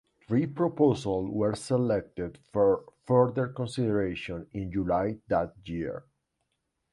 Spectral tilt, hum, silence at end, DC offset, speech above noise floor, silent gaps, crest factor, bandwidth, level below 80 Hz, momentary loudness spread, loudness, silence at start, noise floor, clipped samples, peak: -7.5 dB/octave; none; 0.95 s; under 0.1%; 52 dB; none; 20 dB; 11.5 kHz; -54 dBFS; 12 LU; -29 LUFS; 0.3 s; -80 dBFS; under 0.1%; -8 dBFS